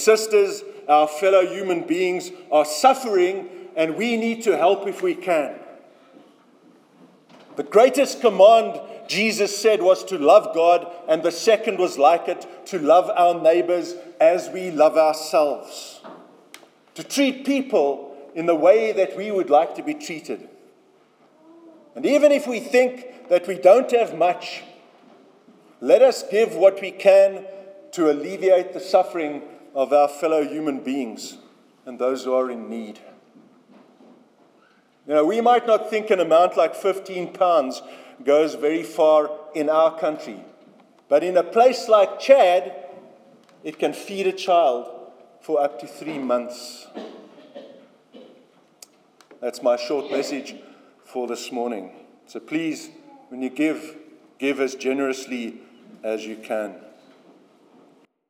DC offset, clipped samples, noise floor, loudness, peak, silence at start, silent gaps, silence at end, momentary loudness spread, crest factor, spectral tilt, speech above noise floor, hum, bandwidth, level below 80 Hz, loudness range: under 0.1%; under 0.1%; -58 dBFS; -20 LUFS; -2 dBFS; 0 s; none; 1.5 s; 18 LU; 20 dB; -4 dB/octave; 38 dB; none; 16 kHz; under -90 dBFS; 10 LU